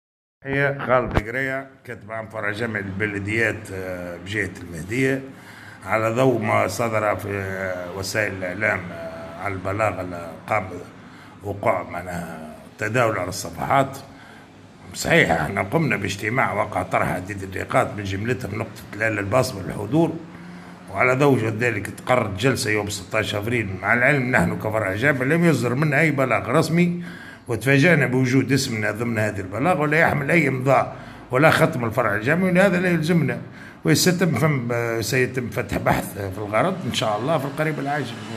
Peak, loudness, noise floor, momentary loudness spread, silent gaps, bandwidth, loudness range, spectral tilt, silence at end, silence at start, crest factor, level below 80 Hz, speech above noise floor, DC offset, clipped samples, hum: 0 dBFS; -21 LUFS; -45 dBFS; 14 LU; none; 14.5 kHz; 7 LU; -5.5 dB/octave; 0 s; 0.45 s; 22 dB; -50 dBFS; 23 dB; under 0.1%; under 0.1%; none